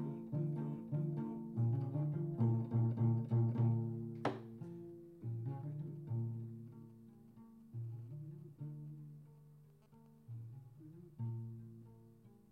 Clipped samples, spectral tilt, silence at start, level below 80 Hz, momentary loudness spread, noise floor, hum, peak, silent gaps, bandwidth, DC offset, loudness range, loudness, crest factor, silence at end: under 0.1%; -10.5 dB/octave; 0 s; -78 dBFS; 22 LU; -64 dBFS; none; -22 dBFS; none; 4.2 kHz; under 0.1%; 15 LU; -41 LUFS; 18 dB; 0.15 s